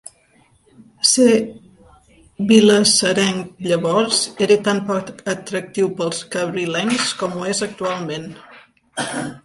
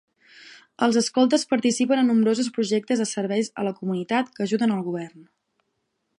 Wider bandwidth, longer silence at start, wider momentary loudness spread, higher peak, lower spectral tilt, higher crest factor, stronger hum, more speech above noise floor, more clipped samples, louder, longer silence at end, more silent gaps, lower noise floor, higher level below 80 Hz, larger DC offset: about the same, 11.5 kHz vs 11.5 kHz; first, 1.05 s vs 0.5 s; first, 13 LU vs 8 LU; first, 0 dBFS vs -6 dBFS; about the same, -3.5 dB/octave vs -4.5 dB/octave; about the same, 18 dB vs 18 dB; neither; second, 38 dB vs 53 dB; neither; first, -18 LUFS vs -23 LUFS; second, 0.05 s vs 0.95 s; neither; second, -56 dBFS vs -75 dBFS; first, -60 dBFS vs -74 dBFS; neither